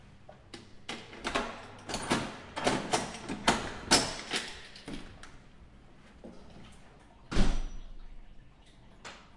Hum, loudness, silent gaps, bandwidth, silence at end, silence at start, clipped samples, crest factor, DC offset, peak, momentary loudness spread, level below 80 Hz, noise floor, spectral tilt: none; -33 LUFS; none; 11.5 kHz; 0.1 s; 0.05 s; under 0.1%; 26 dB; under 0.1%; -10 dBFS; 24 LU; -42 dBFS; -56 dBFS; -3 dB/octave